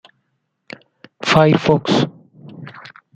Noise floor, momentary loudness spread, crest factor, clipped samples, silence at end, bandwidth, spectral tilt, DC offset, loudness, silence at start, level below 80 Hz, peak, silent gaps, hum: -70 dBFS; 26 LU; 18 dB; under 0.1%; 0.35 s; 9.2 kHz; -6 dB/octave; under 0.1%; -15 LUFS; 1.2 s; -52 dBFS; -2 dBFS; none; none